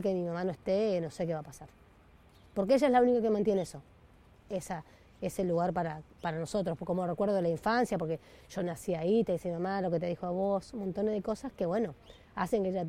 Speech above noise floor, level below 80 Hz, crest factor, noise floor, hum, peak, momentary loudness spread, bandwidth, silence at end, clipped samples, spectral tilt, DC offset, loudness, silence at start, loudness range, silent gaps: 28 dB; -60 dBFS; 18 dB; -60 dBFS; none; -14 dBFS; 12 LU; 16 kHz; 0 s; under 0.1%; -6.5 dB/octave; under 0.1%; -32 LUFS; 0 s; 4 LU; none